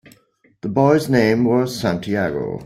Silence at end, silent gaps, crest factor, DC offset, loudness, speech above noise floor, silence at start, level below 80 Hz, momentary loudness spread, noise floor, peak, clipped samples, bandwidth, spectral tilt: 0 s; none; 16 dB; under 0.1%; -18 LUFS; 40 dB; 0.65 s; -52 dBFS; 8 LU; -58 dBFS; -2 dBFS; under 0.1%; 15.5 kHz; -6.5 dB/octave